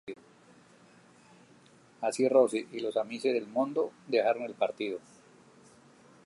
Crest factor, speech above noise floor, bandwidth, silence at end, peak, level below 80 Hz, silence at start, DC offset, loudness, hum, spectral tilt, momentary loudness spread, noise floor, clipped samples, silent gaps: 22 dB; 30 dB; 11.5 kHz; 1.25 s; -12 dBFS; -84 dBFS; 0.05 s; under 0.1%; -30 LUFS; none; -4.5 dB/octave; 12 LU; -59 dBFS; under 0.1%; none